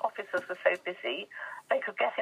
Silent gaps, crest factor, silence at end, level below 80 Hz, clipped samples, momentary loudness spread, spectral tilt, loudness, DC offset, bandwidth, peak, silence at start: none; 20 dB; 0 s; under -90 dBFS; under 0.1%; 8 LU; -3.5 dB/octave; -32 LUFS; under 0.1%; 14.5 kHz; -12 dBFS; 0 s